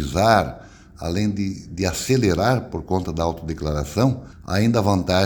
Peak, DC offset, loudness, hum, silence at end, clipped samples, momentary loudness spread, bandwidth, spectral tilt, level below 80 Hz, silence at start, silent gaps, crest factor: 0 dBFS; under 0.1%; -22 LUFS; none; 0 s; under 0.1%; 10 LU; 19 kHz; -6 dB/octave; -38 dBFS; 0 s; none; 20 dB